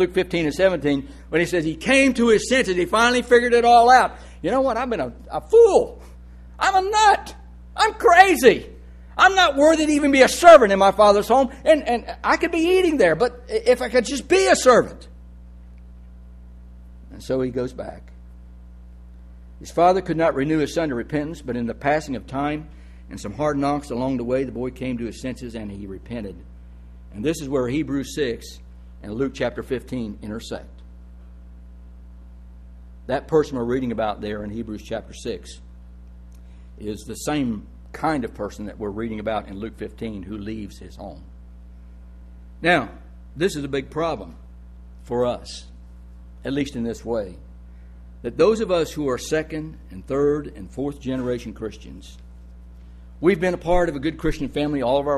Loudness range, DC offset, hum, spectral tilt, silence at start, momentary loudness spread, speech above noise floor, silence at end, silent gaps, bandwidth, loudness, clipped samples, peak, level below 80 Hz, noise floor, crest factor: 16 LU; under 0.1%; 60 Hz at -40 dBFS; -4.5 dB/octave; 0 s; 19 LU; 22 dB; 0 s; none; 13 kHz; -20 LUFS; under 0.1%; 0 dBFS; -40 dBFS; -42 dBFS; 22 dB